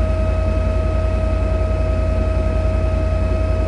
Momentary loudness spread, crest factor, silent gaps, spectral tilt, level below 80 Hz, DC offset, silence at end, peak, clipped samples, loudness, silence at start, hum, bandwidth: 0 LU; 10 dB; none; -8.5 dB/octave; -20 dBFS; under 0.1%; 0 s; -6 dBFS; under 0.1%; -20 LUFS; 0 s; none; 9.4 kHz